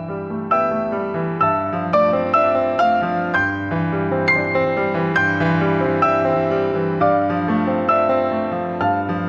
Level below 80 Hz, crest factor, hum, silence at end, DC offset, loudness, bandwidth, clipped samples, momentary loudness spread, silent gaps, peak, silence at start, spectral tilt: -54 dBFS; 14 dB; none; 0 s; under 0.1%; -18 LUFS; 7 kHz; under 0.1%; 5 LU; none; -4 dBFS; 0 s; -8 dB/octave